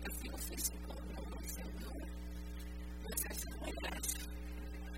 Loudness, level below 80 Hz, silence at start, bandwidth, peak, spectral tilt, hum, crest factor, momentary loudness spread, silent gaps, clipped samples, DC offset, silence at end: -44 LUFS; -46 dBFS; 0 s; 16.5 kHz; -22 dBFS; -3.5 dB/octave; none; 20 dB; 9 LU; none; under 0.1%; 0.1%; 0 s